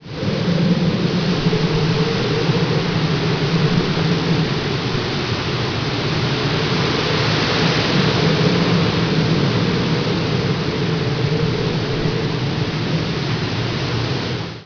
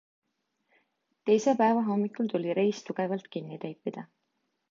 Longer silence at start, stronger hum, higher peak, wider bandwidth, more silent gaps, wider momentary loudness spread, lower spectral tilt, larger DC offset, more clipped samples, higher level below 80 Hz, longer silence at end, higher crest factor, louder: second, 0 s vs 1.25 s; neither; first, -4 dBFS vs -12 dBFS; second, 5.4 kHz vs 7.6 kHz; neither; second, 5 LU vs 14 LU; about the same, -6 dB/octave vs -6.5 dB/octave; neither; neither; first, -38 dBFS vs -82 dBFS; second, 0 s vs 0.65 s; about the same, 14 dB vs 18 dB; first, -18 LUFS vs -29 LUFS